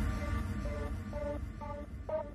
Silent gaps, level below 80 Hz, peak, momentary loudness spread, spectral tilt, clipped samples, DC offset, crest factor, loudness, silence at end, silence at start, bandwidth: none; -40 dBFS; -24 dBFS; 6 LU; -7.5 dB/octave; under 0.1%; under 0.1%; 14 dB; -40 LUFS; 0 s; 0 s; 13.5 kHz